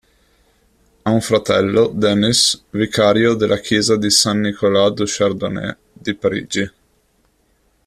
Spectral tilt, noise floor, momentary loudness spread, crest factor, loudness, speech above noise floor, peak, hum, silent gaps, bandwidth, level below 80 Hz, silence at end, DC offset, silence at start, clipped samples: -4 dB/octave; -60 dBFS; 11 LU; 18 dB; -16 LUFS; 44 dB; 0 dBFS; none; none; 14 kHz; -50 dBFS; 1.15 s; under 0.1%; 1.05 s; under 0.1%